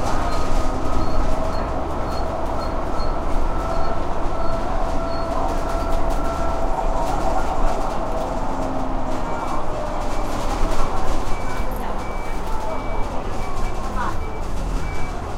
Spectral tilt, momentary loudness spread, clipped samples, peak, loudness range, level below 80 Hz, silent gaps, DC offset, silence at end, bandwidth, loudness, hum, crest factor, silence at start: -6 dB/octave; 4 LU; under 0.1%; -4 dBFS; 4 LU; -24 dBFS; none; under 0.1%; 0 s; 10.5 kHz; -25 LUFS; none; 14 dB; 0 s